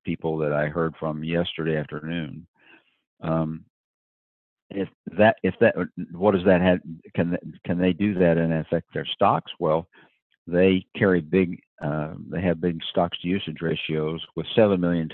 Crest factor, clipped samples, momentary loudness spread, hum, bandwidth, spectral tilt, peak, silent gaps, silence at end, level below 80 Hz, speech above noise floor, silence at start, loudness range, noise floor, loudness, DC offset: 20 dB; under 0.1%; 11 LU; none; 4.2 kHz; -10.5 dB/octave; -4 dBFS; 2.48-2.54 s, 3.07-3.17 s, 3.70-4.70 s, 4.94-5.04 s, 10.22-10.30 s, 10.38-10.46 s, 11.67-11.78 s; 0 s; -50 dBFS; 33 dB; 0.05 s; 7 LU; -57 dBFS; -24 LUFS; under 0.1%